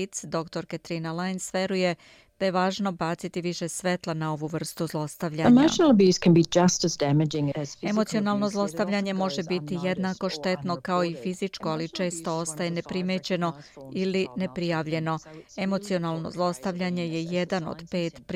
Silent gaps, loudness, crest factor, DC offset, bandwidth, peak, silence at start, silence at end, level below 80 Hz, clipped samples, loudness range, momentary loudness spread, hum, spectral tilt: none; -26 LUFS; 18 dB; under 0.1%; 15.5 kHz; -8 dBFS; 0 s; 0 s; -60 dBFS; under 0.1%; 8 LU; 12 LU; none; -5.5 dB/octave